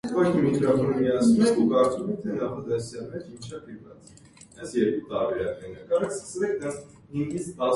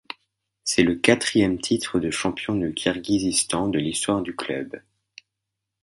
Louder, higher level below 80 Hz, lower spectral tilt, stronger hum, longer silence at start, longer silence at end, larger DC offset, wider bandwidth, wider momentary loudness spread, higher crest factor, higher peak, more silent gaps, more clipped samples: about the same, -25 LUFS vs -23 LUFS; second, -58 dBFS vs -52 dBFS; first, -6.5 dB/octave vs -3.5 dB/octave; neither; second, 0.05 s vs 0.65 s; second, 0 s vs 1.05 s; neither; about the same, 11.5 kHz vs 12 kHz; first, 19 LU vs 12 LU; second, 16 dB vs 24 dB; second, -10 dBFS vs 0 dBFS; neither; neither